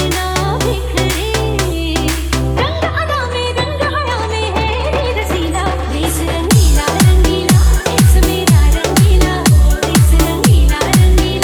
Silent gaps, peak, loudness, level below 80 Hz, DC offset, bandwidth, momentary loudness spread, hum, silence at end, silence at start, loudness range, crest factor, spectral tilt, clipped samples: none; 0 dBFS; -13 LUFS; -16 dBFS; under 0.1%; over 20 kHz; 6 LU; none; 0 s; 0 s; 5 LU; 12 dB; -5 dB/octave; under 0.1%